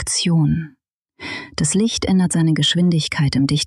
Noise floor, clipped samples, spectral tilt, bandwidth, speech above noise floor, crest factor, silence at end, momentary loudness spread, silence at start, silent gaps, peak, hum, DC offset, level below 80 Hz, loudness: -39 dBFS; under 0.1%; -4.5 dB/octave; 12.5 kHz; 22 dB; 8 dB; 0 s; 14 LU; 0 s; 0.94-1.02 s; -10 dBFS; none; under 0.1%; -42 dBFS; -17 LUFS